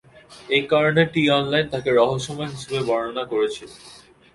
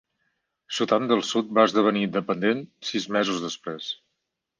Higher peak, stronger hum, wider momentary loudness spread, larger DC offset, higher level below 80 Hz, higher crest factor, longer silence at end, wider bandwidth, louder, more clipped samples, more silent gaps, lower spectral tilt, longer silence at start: about the same, -2 dBFS vs -4 dBFS; neither; about the same, 10 LU vs 12 LU; neither; first, -56 dBFS vs -72 dBFS; about the same, 20 dB vs 22 dB; second, 0.35 s vs 0.65 s; first, 11.5 kHz vs 10 kHz; first, -21 LUFS vs -24 LUFS; neither; neither; about the same, -5.5 dB/octave vs -4.5 dB/octave; second, 0.3 s vs 0.7 s